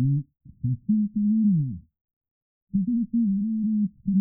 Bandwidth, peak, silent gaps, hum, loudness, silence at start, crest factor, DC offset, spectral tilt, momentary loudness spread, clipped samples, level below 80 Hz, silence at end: 0.4 kHz; -14 dBFS; 2.01-2.05 s, 2.13-2.21 s, 2.31-2.67 s; none; -25 LUFS; 0 s; 10 dB; under 0.1%; -28 dB/octave; 10 LU; under 0.1%; -56 dBFS; 0 s